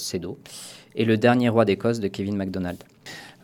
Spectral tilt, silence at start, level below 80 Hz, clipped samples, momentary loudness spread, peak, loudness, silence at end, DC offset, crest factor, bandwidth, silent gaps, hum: -6 dB/octave; 0 s; -60 dBFS; under 0.1%; 21 LU; -4 dBFS; -23 LUFS; 0.1 s; under 0.1%; 20 dB; 16.5 kHz; none; none